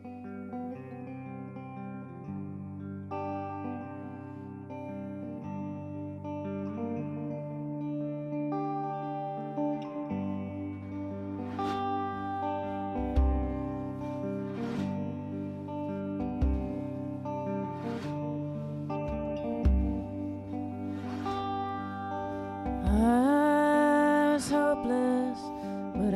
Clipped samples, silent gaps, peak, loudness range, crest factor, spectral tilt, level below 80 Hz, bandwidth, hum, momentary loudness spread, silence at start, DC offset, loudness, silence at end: under 0.1%; none; -14 dBFS; 13 LU; 18 dB; -7.5 dB/octave; -40 dBFS; 13 kHz; none; 15 LU; 0 s; under 0.1%; -33 LUFS; 0 s